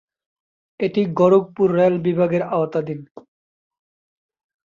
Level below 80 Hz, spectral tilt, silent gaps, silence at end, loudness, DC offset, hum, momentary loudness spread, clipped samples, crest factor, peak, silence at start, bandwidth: -62 dBFS; -9 dB/octave; 3.11-3.15 s; 1.5 s; -19 LUFS; under 0.1%; none; 10 LU; under 0.1%; 18 dB; -4 dBFS; 0.8 s; 7.2 kHz